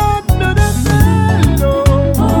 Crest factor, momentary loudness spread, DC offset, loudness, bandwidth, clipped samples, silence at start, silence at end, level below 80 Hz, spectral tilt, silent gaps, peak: 10 dB; 3 LU; under 0.1%; -12 LUFS; 19.5 kHz; under 0.1%; 0 s; 0 s; -18 dBFS; -6.5 dB/octave; none; 0 dBFS